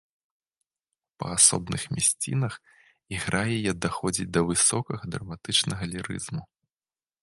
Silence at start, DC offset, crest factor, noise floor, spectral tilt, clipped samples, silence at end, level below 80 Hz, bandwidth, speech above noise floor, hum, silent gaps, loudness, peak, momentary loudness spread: 1.2 s; under 0.1%; 26 dB; under -90 dBFS; -3 dB/octave; under 0.1%; 0.75 s; -52 dBFS; 12 kHz; over 63 dB; none; none; -25 LUFS; -2 dBFS; 17 LU